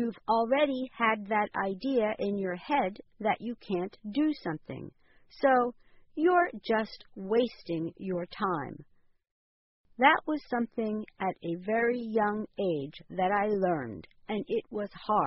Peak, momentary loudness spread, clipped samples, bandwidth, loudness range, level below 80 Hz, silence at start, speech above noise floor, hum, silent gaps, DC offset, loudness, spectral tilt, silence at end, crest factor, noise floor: -8 dBFS; 12 LU; under 0.1%; 5.8 kHz; 3 LU; -66 dBFS; 0 s; over 60 dB; none; 9.31-9.84 s; under 0.1%; -30 LUFS; -4 dB/octave; 0 s; 22 dB; under -90 dBFS